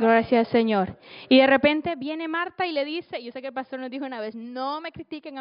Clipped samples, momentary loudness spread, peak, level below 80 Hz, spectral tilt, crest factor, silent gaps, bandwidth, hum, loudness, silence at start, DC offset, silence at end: under 0.1%; 16 LU; -6 dBFS; -62 dBFS; -2.5 dB/octave; 18 dB; none; 5.4 kHz; none; -24 LUFS; 0 s; under 0.1%; 0 s